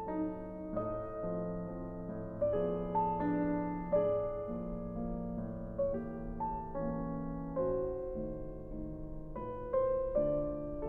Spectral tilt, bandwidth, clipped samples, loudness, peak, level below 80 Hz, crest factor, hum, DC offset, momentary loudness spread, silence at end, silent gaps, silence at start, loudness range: -11.5 dB/octave; 3.5 kHz; under 0.1%; -37 LUFS; -20 dBFS; -48 dBFS; 16 dB; none; under 0.1%; 10 LU; 0 s; none; 0 s; 4 LU